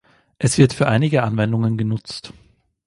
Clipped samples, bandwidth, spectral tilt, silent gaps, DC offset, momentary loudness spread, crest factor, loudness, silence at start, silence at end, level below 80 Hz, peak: under 0.1%; 11.5 kHz; -6 dB/octave; none; under 0.1%; 12 LU; 18 dB; -18 LUFS; 0.4 s; 0.6 s; -50 dBFS; 0 dBFS